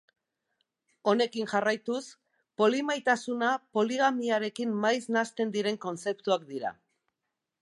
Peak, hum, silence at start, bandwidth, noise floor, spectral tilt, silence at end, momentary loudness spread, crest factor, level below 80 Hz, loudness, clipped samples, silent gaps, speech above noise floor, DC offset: -10 dBFS; none; 1.05 s; 11.5 kHz; -86 dBFS; -4 dB/octave; 0.9 s; 9 LU; 20 dB; -82 dBFS; -29 LUFS; under 0.1%; none; 57 dB; under 0.1%